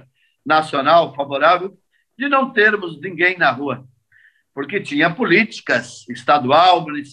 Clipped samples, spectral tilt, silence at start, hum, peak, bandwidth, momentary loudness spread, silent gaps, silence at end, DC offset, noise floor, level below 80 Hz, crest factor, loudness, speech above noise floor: under 0.1%; -5 dB/octave; 0.45 s; none; -2 dBFS; 10.5 kHz; 14 LU; none; 0.05 s; under 0.1%; -55 dBFS; -68 dBFS; 16 dB; -16 LUFS; 38 dB